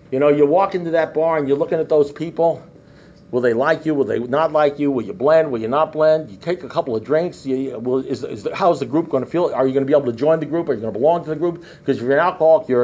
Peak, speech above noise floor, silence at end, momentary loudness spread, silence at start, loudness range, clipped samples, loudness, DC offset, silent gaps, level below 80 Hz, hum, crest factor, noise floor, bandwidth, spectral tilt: -4 dBFS; 28 dB; 0 s; 8 LU; 0.1 s; 2 LU; under 0.1%; -19 LUFS; under 0.1%; none; -58 dBFS; none; 14 dB; -45 dBFS; 7.8 kHz; -7.5 dB/octave